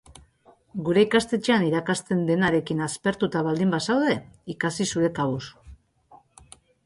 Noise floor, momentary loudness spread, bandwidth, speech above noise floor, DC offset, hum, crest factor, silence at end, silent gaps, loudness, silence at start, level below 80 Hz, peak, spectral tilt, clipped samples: -58 dBFS; 9 LU; 11.5 kHz; 35 dB; under 0.1%; none; 18 dB; 0.7 s; none; -24 LUFS; 0.75 s; -56 dBFS; -8 dBFS; -5.5 dB/octave; under 0.1%